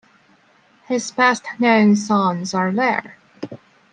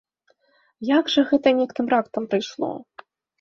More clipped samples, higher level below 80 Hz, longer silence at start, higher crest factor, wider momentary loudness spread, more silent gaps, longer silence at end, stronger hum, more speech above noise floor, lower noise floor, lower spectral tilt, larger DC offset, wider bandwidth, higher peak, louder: neither; about the same, -70 dBFS vs -66 dBFS; about the same, 0.9 s vs 0.8 s; about the same, 16 dB vs 18 dB; first, 20 LU vs 11 LU; neither; second, 0.35 s vs 0.6 s; neither; second, 38 dB vs 44 dB; second, -55 dBFS vs -65 dBFS; about the same, -5 dB/octave vs -5 dB/octave; neither; first, 9.6 kHz vs 7.2 kHz; about the same, -4 dBFS vs -4 dBFS; first, -18 LUFS vs -22 LUFS